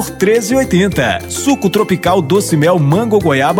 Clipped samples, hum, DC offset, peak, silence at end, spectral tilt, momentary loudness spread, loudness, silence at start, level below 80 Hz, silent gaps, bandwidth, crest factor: under 0.1%; none; under 0.1%; 0 dBFS; 0 s; -5.5 dB/octave; 4 LU; -12 LUFS; 0 s; -38 dBFS; none; 18 kHz; 12 dB